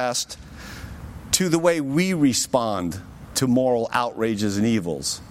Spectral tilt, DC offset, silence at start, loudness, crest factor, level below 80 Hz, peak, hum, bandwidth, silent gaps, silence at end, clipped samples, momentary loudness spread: -4 dB/octave; under 0.1%; 0 s; -22 LUFS; 18 dB; -48 dBFS; -4 dBFS; none; 16.5 kHz; none; 0 s; under 0.1%; 18 LU